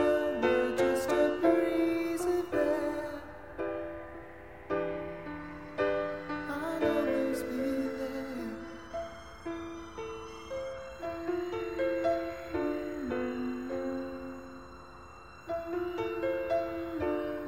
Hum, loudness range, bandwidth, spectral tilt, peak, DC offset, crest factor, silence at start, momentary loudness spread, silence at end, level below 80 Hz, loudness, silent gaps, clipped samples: none; 8 LU; 16.5 kHz; -5.5 dB/octave; -14 dBFS; 0.2%; 20 dB; 0 s; 16 LU; 0 s; -58 dBFS; -33 LUFS; none; under 0.1%